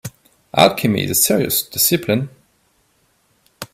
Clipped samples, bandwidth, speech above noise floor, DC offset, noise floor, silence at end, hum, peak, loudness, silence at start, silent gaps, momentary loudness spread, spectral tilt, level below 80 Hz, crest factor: under 0.1%; 16.5 kHz; 45 dB; under 0.1%; -61 dBFS; 0.1 s; none; 0 dBFS; -16 LUFS; 0.05 s; none; 16 LU; -3.5 dB/octave; -54 dBFS; 20 dB